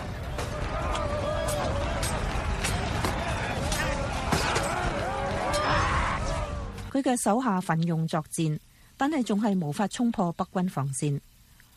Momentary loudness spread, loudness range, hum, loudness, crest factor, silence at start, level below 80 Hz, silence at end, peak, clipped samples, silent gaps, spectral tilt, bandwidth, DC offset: 6 LU; 2 LU; none; -28 LUFS; 16 dB; 0 s; -38 dBFS; 0.55 s; -12 dBFS; under 0.1%; none; -5 dB/octave; 15 kHz; under 0.1%